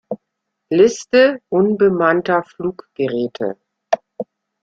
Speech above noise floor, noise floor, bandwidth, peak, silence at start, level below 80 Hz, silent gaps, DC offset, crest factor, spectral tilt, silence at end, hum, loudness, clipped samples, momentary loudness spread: 61 dB; -76 dBFS; 7.6 kHz; -2 dBFS; 0.1 s; -60 dBFS; none; under 0.1%; 16 dB; -5.5 dB/octave; 0.4 s; none; -17 LUFS; under 0.1%; 18 LU